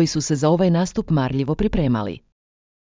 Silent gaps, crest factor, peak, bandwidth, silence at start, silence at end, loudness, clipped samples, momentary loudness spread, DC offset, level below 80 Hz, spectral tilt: none; 16 dB; -4 dBFS; 7.6 kHz; 0 s; 0.8 s; -20 LUFS; under 0.1%; 7 LU; under 0.1%; -38 dBFS; -6.5 dB/octave